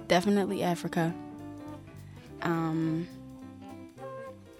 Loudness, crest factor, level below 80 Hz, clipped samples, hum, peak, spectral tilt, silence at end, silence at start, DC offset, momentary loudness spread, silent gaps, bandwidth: -31 LUFS; 22 dB; -62 dBFS; under 0.1%; none; -10 dBFS; -6 dB/octave; 0 s; 0 s; under 0.1%; 19 LU; none; 15.5 kHz